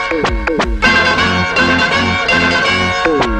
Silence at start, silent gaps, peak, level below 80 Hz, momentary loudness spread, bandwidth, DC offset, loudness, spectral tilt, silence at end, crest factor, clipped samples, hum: 0 s; none; 0 dBFS; -26 dBFS; 5 LU; 11 kHz; under 0.1%; -12 LUFS; -4 dB/octave; 0 s; 12 dB; under 0.1%; none